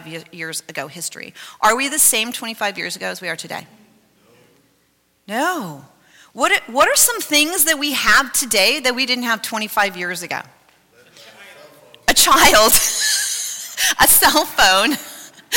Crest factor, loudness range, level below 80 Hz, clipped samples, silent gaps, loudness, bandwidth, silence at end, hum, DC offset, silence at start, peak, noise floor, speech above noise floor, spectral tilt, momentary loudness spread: 16 dB; 13 LU; -44 dBFS; under 0.1%; none; -15 LUFS; 17 kHz; 0 s; none; under 0.1%; 0 s; -2 dBFS; -62 dBFS; 45 dB; -0.5 dB/octave; 17 LU